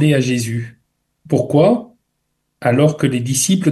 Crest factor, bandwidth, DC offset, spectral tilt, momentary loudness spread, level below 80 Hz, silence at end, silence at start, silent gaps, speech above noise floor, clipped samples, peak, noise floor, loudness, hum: 16 dB; 12.5 kHz; under 0.1%; -5.5 dB/octave; 9 LU; -54 dBFS; 0 s; 0 s; none; 56 dB; under 0.1%; -2 dBFS; -71 dBFS; -16 LUFS; none